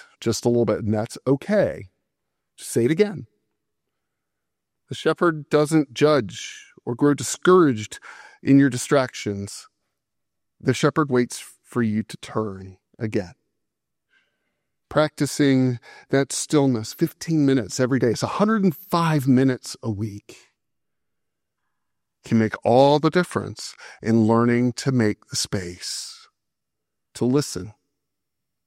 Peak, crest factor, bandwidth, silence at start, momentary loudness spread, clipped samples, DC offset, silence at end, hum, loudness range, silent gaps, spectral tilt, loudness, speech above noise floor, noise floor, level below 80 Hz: -2 dBFS; 20 dB; 16 kHz; 0.2 s; 15 LU; under 0.1%; under 0.1%; 0.95 s; none; 8 LU; none; -5.5 dB/octave; -22 LUFS; 63 dB; -84 dBFS; -62 dBFS